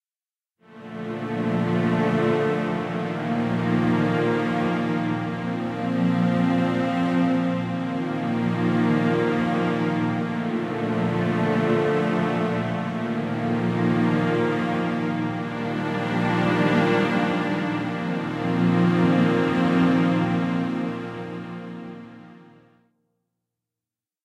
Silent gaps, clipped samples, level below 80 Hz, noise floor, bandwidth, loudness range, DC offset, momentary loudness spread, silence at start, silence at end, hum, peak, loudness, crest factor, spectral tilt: none; under 0.1%; -58 dBFS; under -90 dBFS; 9.6 kHz; 3 LU; under 0.1%; 8 LU; 0.7 s; 1.8 s; none; -8 dBFS; -23 LUFS; 16 dB; -8 dB/octave